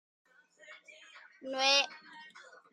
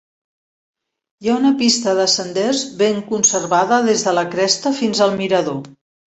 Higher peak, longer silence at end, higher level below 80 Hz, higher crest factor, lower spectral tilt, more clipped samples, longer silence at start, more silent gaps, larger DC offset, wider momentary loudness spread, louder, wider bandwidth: second, -12 dBFS vs -2 dBFS; about the same, 0.3 s vs 0.4 s; second, under -90 dBFS vs -62 dBFS; first, 24 dB vs 16 dB; second, 1 dB/octave vs -3 dB/octave; neither; second, 0.7 s vs 1.2 s; neither; neither; first, 27 LU vs 5 LU; second, -29 LUFS vs -16 LUFS; first, 11.5 kHz vs 8.4 kHz